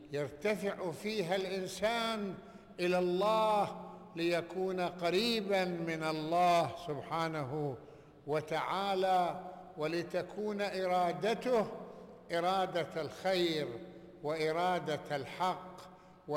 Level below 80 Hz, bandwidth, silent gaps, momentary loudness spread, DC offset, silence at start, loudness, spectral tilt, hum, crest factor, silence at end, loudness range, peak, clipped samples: -70 dBFS; 17 kHz; none; 13 LU; under 0.1%; 0 s; -35 LUFS; -5 dB/octave; none; 12 dB; 0 s; 3 LU; -22 dBFS; under 0.1%